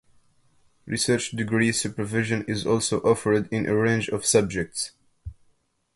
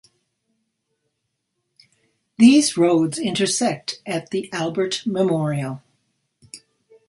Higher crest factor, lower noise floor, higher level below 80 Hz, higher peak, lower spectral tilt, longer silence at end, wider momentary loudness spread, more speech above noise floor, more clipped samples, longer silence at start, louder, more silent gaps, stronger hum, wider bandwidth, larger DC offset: about the same, 20 dB vs 20 dB; second, -66 dBFS vs -76 dBFS; first, -52 dBFS vs -64 dBFS; second, -6 dBFS vs -2 dBFS; about the same, -4.5 dB/octave vs -4.5 dB/octave; first, 0.65 s vs 0.5 s; second, 11 LU vs 14 LU; second, 43 dB vs 57 dB; neither; second, 0.85 s vs 2.4 s; second, -24 LUFS vs -20 LUFS; neither; neither; about the same, 12 kHz vs 11.5 kHz; neither